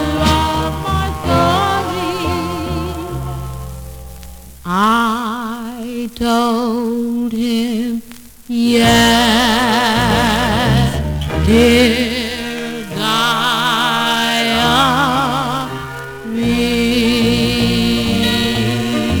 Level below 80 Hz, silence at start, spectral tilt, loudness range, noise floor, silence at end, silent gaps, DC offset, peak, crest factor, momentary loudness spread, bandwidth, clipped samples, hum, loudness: -30 dBFS; 0 s; -4.5 dB/octave; 7 LU; -36 dBFS; 0 s; none; under 0.1%; -2 dBFS; 14 dB; 13 LU; over 20 kHz; under 0.1%; none; -15 LUFS